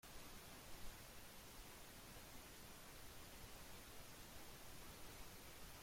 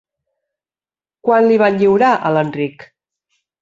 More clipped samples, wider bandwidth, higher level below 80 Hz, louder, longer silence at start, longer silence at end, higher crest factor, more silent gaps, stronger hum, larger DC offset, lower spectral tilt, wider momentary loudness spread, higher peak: neither; first, 16.5 kHz vs 7.6 kHz; about the same, -64 dBFS vs -60 dBFS; second, -58 LUFS vs -14 LUFS; second, 0.05 s vs 1.25 s; second, 0 s vs 0.9 s; about the same, 16 dB vs 14 dB; neither; neither; neither; second, -2.5 dB/octave vs -7.5 dB/octave; second, 1 LU vs 11 LU; second, -40 dBFS vs -2 dBFS